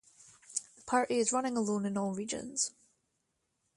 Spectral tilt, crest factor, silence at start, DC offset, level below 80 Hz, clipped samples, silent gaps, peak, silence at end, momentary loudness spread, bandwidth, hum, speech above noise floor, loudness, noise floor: -3.5 dB/octave; 20 dB; 0.5 s; under 0.1%; -74 dBFS; under 0.1%; none; -16 dBFS; 1.05 s; 9 LU; 11.5 kHz; none; 49 dB; -33 LUFS; -81 dBFS